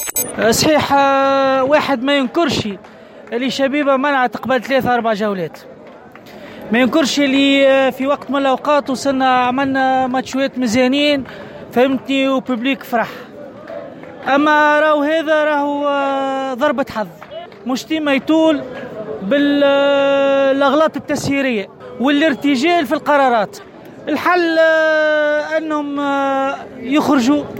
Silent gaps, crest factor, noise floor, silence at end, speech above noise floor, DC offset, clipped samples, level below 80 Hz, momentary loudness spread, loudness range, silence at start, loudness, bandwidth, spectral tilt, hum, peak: none; 12 dB; -38 dBFS; 0 s; 23 dB; under 0.1%; under 0.1%; -54 dBFS; 14 LU; 3 LU; 0 s; -15 LUFS; 16.5 kHz; -4 dB/octave; none; -4 dBFS